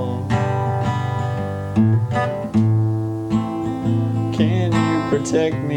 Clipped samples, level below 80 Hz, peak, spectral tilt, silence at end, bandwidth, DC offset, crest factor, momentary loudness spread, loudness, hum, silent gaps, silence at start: under 0.1%; -46 dBFS; -4 dBFS; -7.5 dB/octave; 0 s; 9.8 kHz; under 0.1%; 14 dB; 5 LU; -20 LUFS; none; none; 0 s